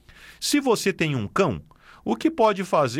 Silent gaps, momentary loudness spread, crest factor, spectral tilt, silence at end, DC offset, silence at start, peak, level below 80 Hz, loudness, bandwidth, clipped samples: none; 9 LU; 16 dB; -4.5 dB/octave; 0 s; under 0.1%; 0.2 s; -8 dBFS; -54 dBFS; -23 LUFS; 17 kHz; under 0.1%